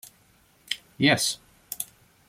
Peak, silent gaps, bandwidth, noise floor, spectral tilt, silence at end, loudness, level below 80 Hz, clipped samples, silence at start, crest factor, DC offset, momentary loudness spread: -6 dBFS; none; 16.5 kHz; -61 dBFS; -3 dB/octave; 0.45 s; -26 LUFS; -66 dBFS; under 0.1%; 0.7 s; 22 dB; under 0.1%; 16 LU